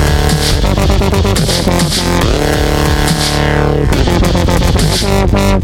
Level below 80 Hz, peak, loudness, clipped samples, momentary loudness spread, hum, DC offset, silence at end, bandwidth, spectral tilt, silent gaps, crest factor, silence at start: -16 dBFS; 0 dBFS; -11 LUFS; under 0.1%; 1 LU; none; under 0.1%; 0 s; 17 kHz; -5 dB/octave; none; 10 dB; 0 s